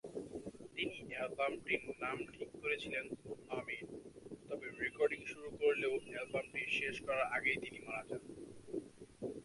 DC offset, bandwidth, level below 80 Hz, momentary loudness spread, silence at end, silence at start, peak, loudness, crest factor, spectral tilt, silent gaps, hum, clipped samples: under 0.1%; 11.5 kHz; -70 dBFS; 13 LU; 0 s; 0.05 s; -20 dBFS; -41 LUFS; 22 dB; -4.5 dB/octave; none; none; under 0.1%